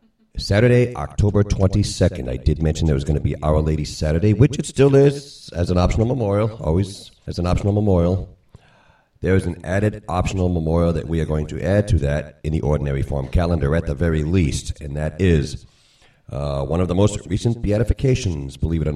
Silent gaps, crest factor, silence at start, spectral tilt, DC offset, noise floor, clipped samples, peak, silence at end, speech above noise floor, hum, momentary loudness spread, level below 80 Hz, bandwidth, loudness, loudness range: none; 18 dB; 0.35 s; -7 dB/octave; under 0.1%; -55 dBFS; under 0.1%; 0 dBFS; 0 s; 36 dB; none; 9 LU; -30 dBFS; 11.5 kHz; -20 LUFS; 4 LU